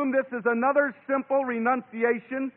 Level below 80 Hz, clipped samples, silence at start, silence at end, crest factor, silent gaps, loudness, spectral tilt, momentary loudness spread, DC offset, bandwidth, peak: -76 dBFS; under 0.1%; 0 s; 0.05 s; 16 dB; none; -26 LUFS; -10.5 dB/octave; 4 LU; under 0.1%; 3.7 kHz; -8 dBFS